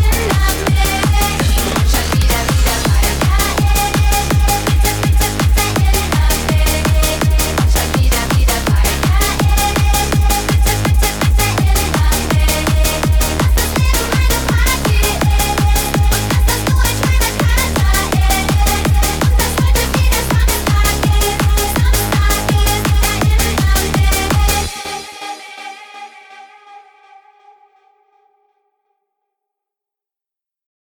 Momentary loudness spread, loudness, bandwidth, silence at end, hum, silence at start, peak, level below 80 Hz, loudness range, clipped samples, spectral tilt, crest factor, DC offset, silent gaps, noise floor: 1 LU; -14 LUFS; over 20 kHz; 4.15 s; none; 0 s; -4 dBFS; -16 dBFS; 2 LU; under 0.1%; -4 dB/octave; 10 dB; under 0.1%; none; -87 dBFS